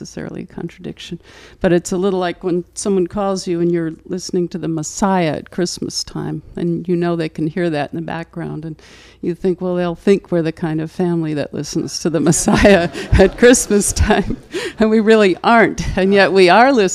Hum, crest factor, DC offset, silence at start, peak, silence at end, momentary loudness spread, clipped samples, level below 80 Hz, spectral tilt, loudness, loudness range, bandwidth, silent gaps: none; 16 dB; under 0.1%; 0 s; 0 dBFS; 0 s; 16 LU; under 0.1%; -32 dBFS; -5 dB/octave; -16 LUFS; 8 LU; 14.5 kHz; none